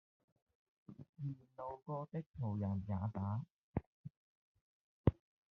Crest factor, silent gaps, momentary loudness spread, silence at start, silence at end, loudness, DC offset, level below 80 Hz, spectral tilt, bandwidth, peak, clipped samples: 28 dB; 1.09-1.13 s, 2.26-2.34 s, 3.50-3.74 s, 3.86-4.04 s, 4.10-4.55 s, 4.61-5.04 s; 20 LU; 0.9 s; 0.4 s; -43 LUFS; under 0.1%; -60 dBFS; -10.5 dB/octave; 4 kHz; -16 dBFS; under 0.1%